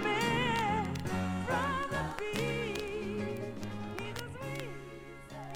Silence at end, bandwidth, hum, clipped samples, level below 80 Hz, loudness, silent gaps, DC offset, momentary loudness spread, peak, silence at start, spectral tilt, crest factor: 0 s; 18 kHz; none; under 0.1%; -54 dBFS; -35 LUFS; none; under 0.1%; 14 LU; -16 dBFS; 0 s; -5 dB/octave; 18 dB